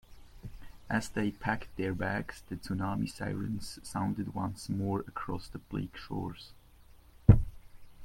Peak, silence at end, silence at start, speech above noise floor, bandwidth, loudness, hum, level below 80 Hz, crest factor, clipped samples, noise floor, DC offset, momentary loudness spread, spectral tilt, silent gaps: -4 dBFS; 0 s; 0.1 s; 22 dB; 16 kHz; -34 LUFS; none; -44 dBFS; 28 dB; under 0.1%; -57 dBFS; under 0.1%; 16 LU; -7 dB/octave; none